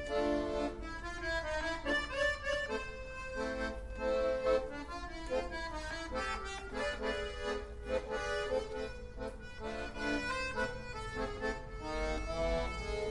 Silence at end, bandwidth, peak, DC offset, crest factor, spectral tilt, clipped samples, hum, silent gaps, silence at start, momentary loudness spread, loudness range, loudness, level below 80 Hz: 0 s; 11.5 kHz; -20 dBFS; under 0.1%; 16 dB; -4.5 dB/octave; under 0.1%; none; none; 0 s; 10 LU; 3 LU; -38 LUFS; -46 dBFS